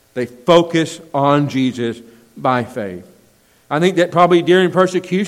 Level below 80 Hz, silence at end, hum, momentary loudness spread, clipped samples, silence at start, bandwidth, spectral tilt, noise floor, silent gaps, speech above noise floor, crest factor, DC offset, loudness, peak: -58 dBFS; 0 s; none; 13 LU; 0.1%; 0.15 s; 13 kHz; -6 dB/octave; -53 dBFS; none; 38 dB; 16 dB; under 0.1%; -15 LUFS; 0 dBFS